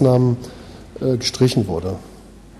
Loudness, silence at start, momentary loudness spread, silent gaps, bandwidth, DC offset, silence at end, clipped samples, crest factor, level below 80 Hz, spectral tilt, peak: -20 LUFS; 0 s; 19 LU; none; 13 kHz; under 0.1%; 0 s; under 0.1%; 18 dB; -44 dBFS; -6.5 dB/octave; -2 dBFS